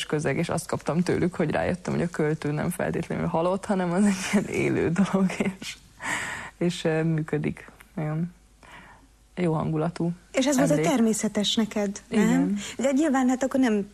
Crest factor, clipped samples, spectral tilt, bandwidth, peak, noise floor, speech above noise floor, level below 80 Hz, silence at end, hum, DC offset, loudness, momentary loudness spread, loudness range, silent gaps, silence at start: 14 dB; under 0.1%; -5.5 dB/octave; 13.5 kHz; -10 dBFS; -53 dBFS; 29 dB; -54 dBFS; 0.05 s; none; under 0.1%; -26 LUFS; 8 LU; 6 LU; none; 0 s